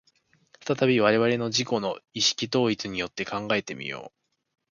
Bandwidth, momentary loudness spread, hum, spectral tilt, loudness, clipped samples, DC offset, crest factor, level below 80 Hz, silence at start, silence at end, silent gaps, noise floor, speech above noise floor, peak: 7.4 kHz; 13 LU; none; -4 dB/octave; -25 LUFS; under 0.1%; under 0.1%; 22 dB; -64 dBFS; 0.65 s; 0.65 s; none; -66 dBFS; 40 dB; -6 dBFS